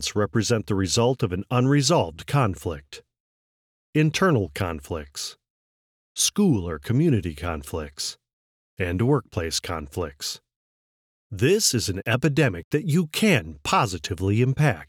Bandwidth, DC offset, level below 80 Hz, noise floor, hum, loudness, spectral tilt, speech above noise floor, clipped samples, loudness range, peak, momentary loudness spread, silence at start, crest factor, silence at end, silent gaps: 17.5 kHz; under 0.1%; -46 dBFS; under -90 dBFS; none; -24 LUFS; -5 dB/octave; over 67 dB; under 0.1%; 6 LU; -6 dBFS; 13 LU; 0 s; 18 dB; 0.05 s; 3.20-3.93 s, 5.50-6.15 s, 8.33-8.77 s, 10.56-11.30 s, 12.64-12.71 s